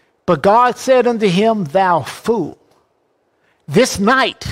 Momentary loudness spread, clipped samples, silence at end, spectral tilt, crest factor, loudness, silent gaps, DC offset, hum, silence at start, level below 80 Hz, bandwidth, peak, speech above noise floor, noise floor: 7 LU; under 0.1%; 0 s; -5 dB/octave; 14 dB; -14 LUFS; none; under 0.1%; none; 0.3 s; -48 dBFS; 16 kHz; -2 dBFS; 48 dB; -62 dBFS